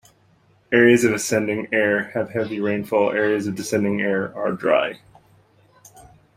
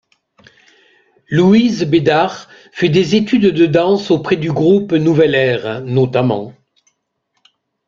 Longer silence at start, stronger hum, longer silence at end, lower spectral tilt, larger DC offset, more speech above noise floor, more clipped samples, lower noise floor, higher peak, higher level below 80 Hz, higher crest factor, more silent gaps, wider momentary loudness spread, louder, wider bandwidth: second, 0.7 s vs 1.3 s; neither; about the same, 1.4 s vs 1.35 s; second, -5 dB/octave vs -7 dB/octave; neither; second, 38 dB vs 56 dB; neither; second, -58 dBFS vs -68 dBFS; about the same, -2 dBFS vs 0 dBFS; second, -62 dBFS vs -52 dBFS; first, 20 dB vs 14 dB; neither; about the same, 9 LU vs 8 LU; second, -20 LUFS vs -14 LUFS; first, 16 kHz vs 7.6 kHz